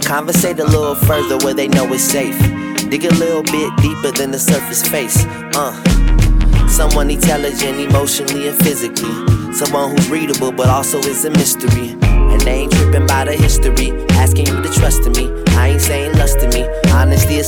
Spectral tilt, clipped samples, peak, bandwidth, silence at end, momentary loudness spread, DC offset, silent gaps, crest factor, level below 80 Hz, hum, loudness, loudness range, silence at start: -4.5 dB/octave; under 0.1%; 0 dBFS; 19.5 kHz; 0 s; 4 LU; under 0.1%; none; 12 dB; -18 dBFS; none; -14 LUFS; 1 LU; 0 s